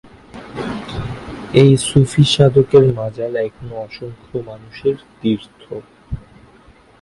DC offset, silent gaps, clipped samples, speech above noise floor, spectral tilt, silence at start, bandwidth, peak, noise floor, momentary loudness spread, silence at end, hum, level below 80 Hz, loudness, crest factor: under 0.1%; none; under 0.1%; 32 dB; -6.5 dB/octave; 0.35 s; 11.5 kHz; 0 dBFS; -47 dBFS; 21 LU; 0.85 s; none; -42 dBFS; -15 LUFS; 18 dB